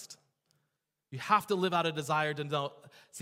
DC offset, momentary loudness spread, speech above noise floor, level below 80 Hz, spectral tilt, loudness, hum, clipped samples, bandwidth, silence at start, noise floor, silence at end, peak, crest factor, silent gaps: under 0.1%; 19 LU; 52 dB; -80 dBFS; -4.5 dB/octave; -31 LUFS; none; under 0.1%; 16 kHz; 0 s; -84 dBFS; 0 s; -12 dBFS; 22 dB; none